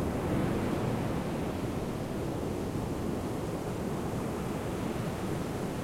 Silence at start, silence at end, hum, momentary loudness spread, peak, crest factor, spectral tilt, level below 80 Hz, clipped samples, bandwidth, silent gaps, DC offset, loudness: 0 s; 0 s; none; 4 LU; -18 dBFS; 14 dB; -6.5 dB/octave; -46 dBFS; under 0.1%; 16.5 kHz; none; under 0.1%; -34 LUFS